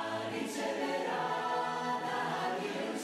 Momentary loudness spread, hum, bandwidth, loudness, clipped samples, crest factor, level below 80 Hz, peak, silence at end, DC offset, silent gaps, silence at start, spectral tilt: 3 LU; none; 15.5 kHz; -35 LUFS; under 0.1%; 12 dB; -80 dBFS; -22 dBFS; 0 s; under 0.1%; none; 0 s; -4 dB/octave